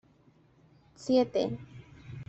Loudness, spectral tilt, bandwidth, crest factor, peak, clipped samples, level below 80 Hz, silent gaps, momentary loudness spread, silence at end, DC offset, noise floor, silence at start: -30 LUFS; -6.5 dB/octave; 8.2 kHz; 20 dB; -14 dBFS; under 0.1%; -64 dBFS; none; 24 LU; 0.05 s; under 0.1%; -63 dBFS; 1 s